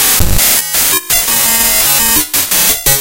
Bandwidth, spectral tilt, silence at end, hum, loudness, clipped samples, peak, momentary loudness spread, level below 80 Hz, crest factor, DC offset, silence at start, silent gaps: over 20 kHz; -1 dB/octave; 0 s; none; -8 LUFS; 0.3%; 0 dBFS; 2 LU; -24 dBFS; 10 dB; under 0.1%; 0 s; none